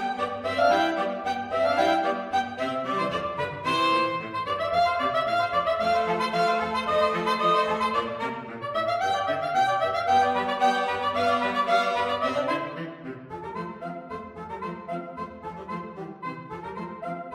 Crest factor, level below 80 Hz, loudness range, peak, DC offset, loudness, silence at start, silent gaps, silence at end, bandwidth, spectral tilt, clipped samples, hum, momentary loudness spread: 16 dB; -60 dBFS; 12 LU; -10 dBFS; under 0.1%; -26 LUFS; 0 s; none; 0 s; 15.5 kHz; -4.5 dB/octave; under 0.1%; none; 14 LU